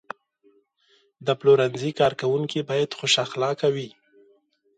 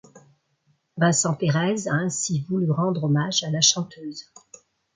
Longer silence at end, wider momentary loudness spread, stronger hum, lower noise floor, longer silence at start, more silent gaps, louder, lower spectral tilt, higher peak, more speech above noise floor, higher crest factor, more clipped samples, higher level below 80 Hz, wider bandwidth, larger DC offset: first, 0.9 s vs 0.75 s; second, 13 LU vs 16 LU; neither; second, -64 dBFS vs -68 dBFS; first, 1.2 s vs 0.15 s; neither; about the same, -23 LUFS vs -22 LUFS; about the same, -4.5 dB/octave vs -4 dB/octave; about the same, -6 dBFS vs -4 dBFS; second, 41 dB vs 45 dB; about the same, 18 dB vs 20 dB; neither; about the same, -68 dBFS vs -66 dBFS; about the same, 9.4 kHz vs 9.6 kHz; neither